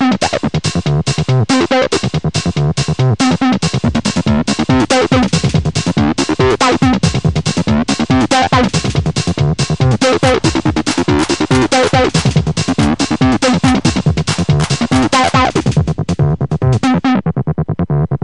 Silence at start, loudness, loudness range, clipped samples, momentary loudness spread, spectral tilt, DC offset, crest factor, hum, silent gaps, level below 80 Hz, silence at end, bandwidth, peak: 0 s; -13 LUFS; 1 LU; under 0.1%; 4 LU; -5.5 dB/octave; 1%; 12 dB; none; none; -30 dBFS; 0.05 s; 11 kHz; 0 dBFS